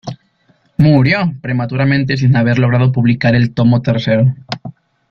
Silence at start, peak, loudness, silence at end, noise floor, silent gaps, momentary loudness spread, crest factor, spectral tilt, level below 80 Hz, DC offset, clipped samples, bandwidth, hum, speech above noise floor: 0.05 s; -2 dBFS; -13 LUFS; 0.4 s; -56 dBFS; none; 15 LU; 12 dB; -8.5 dB/octave; -44 dBFS; under 0.1%; under 0.1%; 6.2 kHz; none; 44 dB